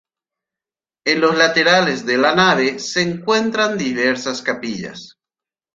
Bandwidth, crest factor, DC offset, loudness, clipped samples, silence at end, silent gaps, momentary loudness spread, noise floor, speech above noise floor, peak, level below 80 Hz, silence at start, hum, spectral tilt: 9 kHz; 18 dB; under 0.1%; -16 LUFS; under 0.1%; 0.7 s; none; 11 LU; under -90 dBFS; over 73 dB; -2 dBFS; -60 dBFS; 1.05 s; none; -3.5 dB/octave